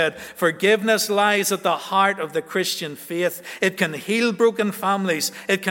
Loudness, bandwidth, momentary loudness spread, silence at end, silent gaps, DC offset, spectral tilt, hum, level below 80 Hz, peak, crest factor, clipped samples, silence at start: -21 LUFS; 17 kHz; 7 LU; 0 s; none; under 0.1%; -3.5 dB/octave; none; -72 dBFS; -2 dBFS; 18 dB; under 0.1%; 0 s